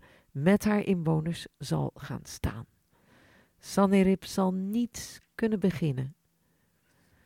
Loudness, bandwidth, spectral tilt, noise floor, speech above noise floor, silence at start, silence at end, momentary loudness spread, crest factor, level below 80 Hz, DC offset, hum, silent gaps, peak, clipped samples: -29 LUFS; 16 kHz; -6.5 dB/octave; -71 dBFS; 43 dB; 0.35 s; 1.15 s; 16 LU; 20 dB; -52 dBFS; under 0.1%; none; none; -10 dBFS; under 0.1%